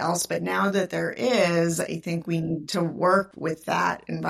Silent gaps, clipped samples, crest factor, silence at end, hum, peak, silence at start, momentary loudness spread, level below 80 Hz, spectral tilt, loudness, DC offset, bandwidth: none; under 0.1%; 16 dB; 0 s; none; -8 dBFS; 0 s; 7 LU; -64 dBFS; -5 dB/octave; -25 LUFS; under 0.1%; 16 kHz